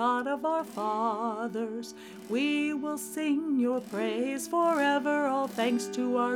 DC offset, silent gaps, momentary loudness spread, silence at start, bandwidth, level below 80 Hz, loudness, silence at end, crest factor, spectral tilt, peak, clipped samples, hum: under 0.1%; none; 8 LU; 0 s; 17.5 kHz; -78 dBFS; -29 LUFS; 0 s; 14 dB; -4 dB/octave; -16 dBFS; under 0.1%; none